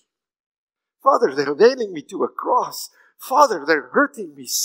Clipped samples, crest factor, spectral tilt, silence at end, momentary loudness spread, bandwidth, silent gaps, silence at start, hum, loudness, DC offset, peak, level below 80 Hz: under 0.1%; 20 dB; -2.5 dB/octave; 0 s; 14 LU; 16.5 kHz; none; 1.05 s; none; -19 LUFS; under 0.1%; 0 dBFS; -78 dBFS